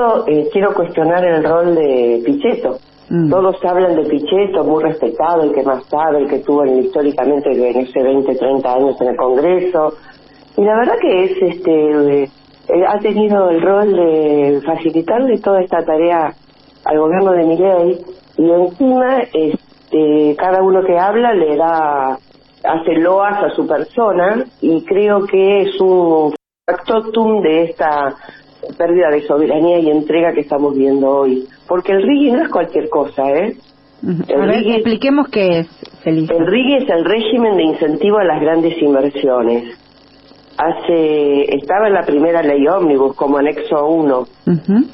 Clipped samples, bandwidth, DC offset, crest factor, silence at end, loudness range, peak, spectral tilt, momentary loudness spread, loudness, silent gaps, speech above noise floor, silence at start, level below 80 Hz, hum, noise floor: under 0.1%; 5.8 kHz; under 0.1%; 10 dB; 0 s; 2 LU; -2 dBFS; -10.5 dB/octave; 6 LU; -14 LUFS; none; 32 dB; 0 s; -52 dBFS; none; -45 dBFS